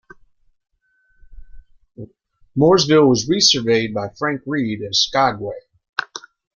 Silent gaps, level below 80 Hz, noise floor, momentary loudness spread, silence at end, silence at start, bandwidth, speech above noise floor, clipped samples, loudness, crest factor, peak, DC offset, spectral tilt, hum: 5.89-5.93 s; -50 dBFS; -61 dBFS; 16 LU; 0.35 s; 1.3 s; 7.4 kHz; 44 dB; under 0.1%; -17 LUFS; 18 dB; -2 dBFS; under 0.1%; -4 dB/octave; none